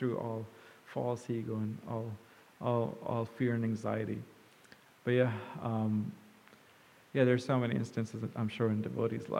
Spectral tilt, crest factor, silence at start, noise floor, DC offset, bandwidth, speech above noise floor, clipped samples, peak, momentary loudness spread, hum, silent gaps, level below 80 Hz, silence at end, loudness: -8 dB/octave; 20 dB; 0 s; -62 dBFS; under 0.1%; 15 kHz; 28 dB; under 0.1%; -14 dBFS; 13 LU; none; none; -76 dBFS; 0 s; -35 LUFS